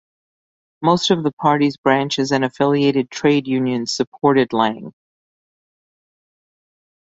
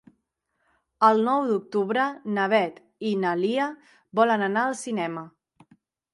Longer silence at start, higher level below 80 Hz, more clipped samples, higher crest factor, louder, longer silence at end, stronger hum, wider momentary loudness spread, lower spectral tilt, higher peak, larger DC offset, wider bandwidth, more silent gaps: second, 0.8 s vs 1 s; first, -62 dBFS vs -78 dBFS; neither; about the same, 18 dB vs 20 dB; first, -18 LUFS vs -24 LUFS; first, 2.15 s vs 0.85 s; neither; second, 5 LU vs 10 LU; about the same, -5.5 dB/octave vs -5.5 dB/octave; first, -2 dBFS vs -6 dBFS; neither; second, 8 kHz vs 11.5 kHz; first, 1.33-1.37 s, 1.78-1.83 s, 4.07-4.12 s vs none